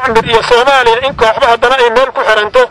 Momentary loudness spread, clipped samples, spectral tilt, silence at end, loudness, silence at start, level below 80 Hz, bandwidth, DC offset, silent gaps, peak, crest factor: 3 LU; 0.1%; -3 dB/octave; 0 s; -8 LUFS; 0 s; -34 dBFS; 12 kHz; 1%; none; 0 dBFS; 8 dB